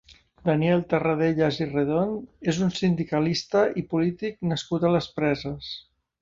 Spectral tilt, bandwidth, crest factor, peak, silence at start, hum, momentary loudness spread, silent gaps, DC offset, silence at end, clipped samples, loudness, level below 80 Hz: -6.5 dB/octave; 7.6 kHz; 18 dB; -8 dBFS; 0.1 s; none; 7 LU; none; under 0.1%; 0.4 s; under 0.1%; -25 LUFS; -54 dBFS